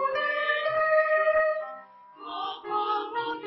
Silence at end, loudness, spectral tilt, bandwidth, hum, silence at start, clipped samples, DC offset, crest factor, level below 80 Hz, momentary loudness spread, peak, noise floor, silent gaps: 0 s; -26 LUFS; -5.5 dB/octave; 5.8 kHz; none; 0 s; under 0.1%; under 0.1%; 14 dB; -70 dBFS; 16 LU; -12 dBFS; -47 dBFS; none